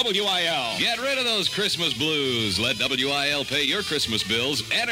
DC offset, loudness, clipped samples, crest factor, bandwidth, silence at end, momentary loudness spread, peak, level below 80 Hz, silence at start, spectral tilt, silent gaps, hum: under 0.1%; -22 LUFS; under 0.1%; 16 dB; 16 kHz; 0 s; 2 LU; -8 dBFS; -54 dBFS; 0 s; -2.5 dB/octave; none; none